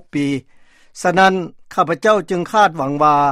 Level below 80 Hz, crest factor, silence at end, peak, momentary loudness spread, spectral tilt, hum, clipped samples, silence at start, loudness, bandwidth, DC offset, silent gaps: -54 dBFS; 16 dB; 0 s; 0 dBFS; 9 LU; -5 dB/octave; none; under 0.1%; 0.15 s; -16 LUFS; 14.5 kHz; under 0.1%; none